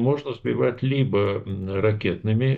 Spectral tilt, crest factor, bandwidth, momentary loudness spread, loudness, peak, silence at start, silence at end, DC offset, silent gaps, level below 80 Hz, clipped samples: -9.5 dB/octave; 14 dB; 4.7 kHz; 5 LU; -24 LUFS; -8 dBFS; 0 s; 0 s; under 0.1%; none; -54 dBFS; under 0.1%